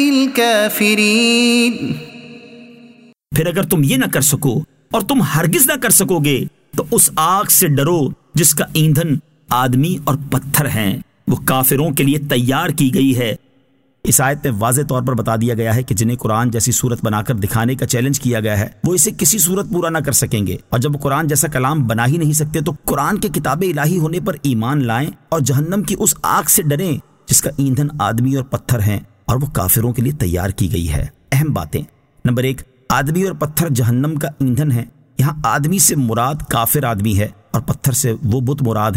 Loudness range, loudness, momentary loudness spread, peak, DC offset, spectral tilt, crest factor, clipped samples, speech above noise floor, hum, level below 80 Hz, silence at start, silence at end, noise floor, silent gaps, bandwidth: 4 LU; -15 LUFS; 9 LU; 0 dBFS; under 0.1%; -4.5 dB/octave; 16 dB; under 0.1%; 41 dB; none; -38 dBFS; 0 s; 0 s; -57 dBFS; none; 16.5 kHz